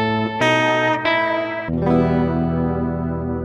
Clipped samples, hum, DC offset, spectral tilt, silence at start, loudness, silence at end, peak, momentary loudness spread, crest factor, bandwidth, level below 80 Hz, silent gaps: under 0.1%; none; under 0.1%; -6.5 dB/octave; 0 s; -19 LUFS; 0 s; -2 dBFS; 7 LU; 16 dB; 11 kHz; -40 dBFS; none